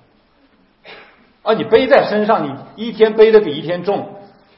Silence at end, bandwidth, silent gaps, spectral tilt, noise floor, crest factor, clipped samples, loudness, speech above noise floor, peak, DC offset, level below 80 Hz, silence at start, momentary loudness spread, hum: 0.35 s; 5.8 kHz; none; -8 dB/octave; -54 dBFS; 16 dB; under 0.1%; -14 LUFS; 41 dB; 0 dBFS; under 0.1%; -52 dBFS; 0.9 s; 16 LU; none